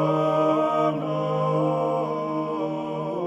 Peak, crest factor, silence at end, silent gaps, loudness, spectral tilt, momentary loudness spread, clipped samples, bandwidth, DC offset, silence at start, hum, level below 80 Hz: -8 dBFS; 14 dB; 0 s; none; -24 LUFS; -8.5 dB/octave; 7 LU; under 0.1%; 11.5 kHz; under 0.1%; 0 s; none; -70 dBFS